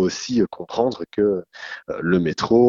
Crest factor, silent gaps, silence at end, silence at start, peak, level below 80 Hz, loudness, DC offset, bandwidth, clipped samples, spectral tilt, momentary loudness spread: 16 dB; none; 0 s; 0 s; -4 dBFS; -52 dBFS; -22 LUFS; under 0.1%; 7.6 kHz; under 0.1%; -6 dB/octave; 10 LU